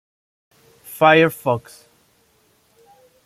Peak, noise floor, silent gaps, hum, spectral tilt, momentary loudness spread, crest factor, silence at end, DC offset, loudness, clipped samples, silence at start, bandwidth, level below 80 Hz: -2 dBFS; -60 dBFS; none; none; -5.5 dB/octave; 14 LU; 20 dB; 1.65 s; under 0.1%; -16 LUFS; under 0.1%; 0.9 s; 15.5 kHz; -64 dBFS